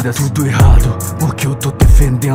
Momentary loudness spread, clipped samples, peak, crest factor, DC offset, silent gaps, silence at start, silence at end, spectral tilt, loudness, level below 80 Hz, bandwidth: 7 LU; 0.7%; 0 dBFS; 10 dB; under 0.1%; none; 0 s; 0 s; -6 dB/octave; -13 LUFS; -14 dBFS; 16.5 kHz